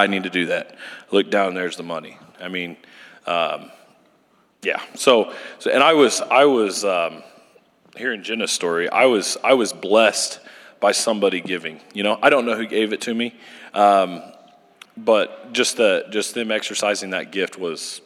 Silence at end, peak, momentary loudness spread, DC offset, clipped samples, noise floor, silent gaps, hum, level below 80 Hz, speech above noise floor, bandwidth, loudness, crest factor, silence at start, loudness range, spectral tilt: 0.05 s; -2 dBFS; 13 LU; under 0.1%; under 0.1%; -59 dBFS; none; none; -78 dBFS; 40 dB; 15 kHz; -20 LUFS; 20 dB; 0 s; 6 LU; -2.5 dB/octave